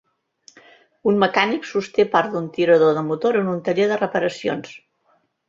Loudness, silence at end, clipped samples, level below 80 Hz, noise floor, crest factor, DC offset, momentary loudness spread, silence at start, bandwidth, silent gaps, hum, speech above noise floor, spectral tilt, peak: -20 LUFS; 0.7 s; under 0.1%; -64 dBFS; -64 dBFS; 20 dB; under 0.1%; 9 LU; 1.05 s; 7.8 kHz; none; none; 45 dB; -6 dB/octave; -2 dBFS